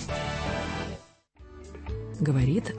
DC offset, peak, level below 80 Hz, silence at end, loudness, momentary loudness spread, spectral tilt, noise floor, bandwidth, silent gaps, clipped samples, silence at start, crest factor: under 0.1%; -14 dBFS; -42 dBFS; 0 s; -30 LUFS; 21 LU; -6.5 dB/octave; -53 dBFS; 8.8 kHz; none; under 0.1%; 0 s; 16 dB